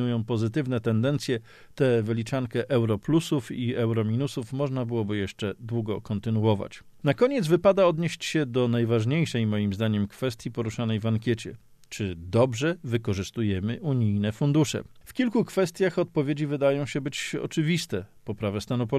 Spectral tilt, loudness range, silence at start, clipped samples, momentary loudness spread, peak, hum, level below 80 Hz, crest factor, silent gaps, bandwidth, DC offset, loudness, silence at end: -6.5 dB/octave; 4 LU; 0 s; under 0.1%; 8 LU; -8 dBFS; none; -58 dBFS; 18 dB; none; 14 kHz; under 0.1%; -27 LUFS; 0 s